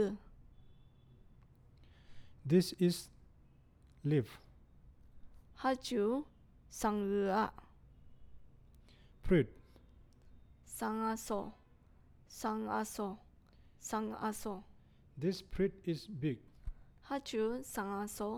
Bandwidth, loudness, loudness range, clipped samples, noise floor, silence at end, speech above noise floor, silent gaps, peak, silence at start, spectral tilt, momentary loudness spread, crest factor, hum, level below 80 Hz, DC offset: 19 kHz; -37 LUFS; 4 LU; under 0.1%; -64 dBFS; 0 s; 28 dB; none; -18 dBFS; 0 s; -6 dB/octave; 18 LU; 22 dB; none; -56 dBFS; under 0.1%